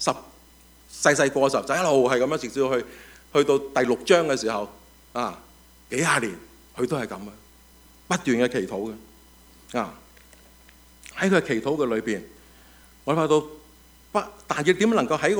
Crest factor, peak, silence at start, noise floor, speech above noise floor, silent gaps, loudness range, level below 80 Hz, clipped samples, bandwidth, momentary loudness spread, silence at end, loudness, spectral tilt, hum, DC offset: 22 dB; -4 dBFS; 0 s; -53 dBFS; 30 dB; none; 7 LU; -56 dBFS; under 0.1%; over 20 kHz; 15 LU; 0 s; -24 LUFS; -4.5 dB/octave; none; under 0.1%